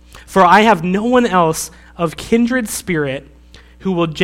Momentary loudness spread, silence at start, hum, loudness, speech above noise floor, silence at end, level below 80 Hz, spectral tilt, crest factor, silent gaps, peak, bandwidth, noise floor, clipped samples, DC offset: 13 LU; 0.15 s; none; -15 LUFS; 28 dB; 0 s; -42 dBFS; -5 dB/octave; 16 dB; none; 0 dBFS; 16.5 kHz; -42 dBFS; 0.1%; under 0.1%